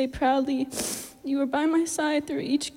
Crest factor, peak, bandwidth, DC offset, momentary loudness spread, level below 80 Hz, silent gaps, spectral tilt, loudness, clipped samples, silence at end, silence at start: 14 dB; -12 dBFS; 16.5 kHz; under 0.1%; 6 LU; -54 dBFS; none; -3 dB/octave; -26 LUFS; under 0.1%; 0.05 s; 0 s